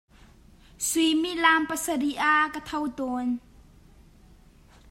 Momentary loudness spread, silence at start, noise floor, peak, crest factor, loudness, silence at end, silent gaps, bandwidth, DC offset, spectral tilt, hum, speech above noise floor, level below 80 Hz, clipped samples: 10 LU; 0.8 s; -54 dBFS; -6 dBFS; 22 dB; -25 LUFS; 1.5 s; none; 16 kHz; under 0.1%; -1.5 dB/octave; none; 29 dB; -56 dBFS; under 0.1%